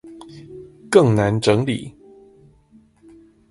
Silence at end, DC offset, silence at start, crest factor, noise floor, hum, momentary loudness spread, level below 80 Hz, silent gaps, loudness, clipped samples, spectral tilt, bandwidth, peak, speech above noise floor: 1.6 s; under 0.1%; 0.05 s; 22 dB; -53 dBFS; none; 25 LU; -50 dBFS; none; -18 LUFS; under 0.1%; -6.5 dB/octave; 11.5 kHz; 0 dBFS; 37 dB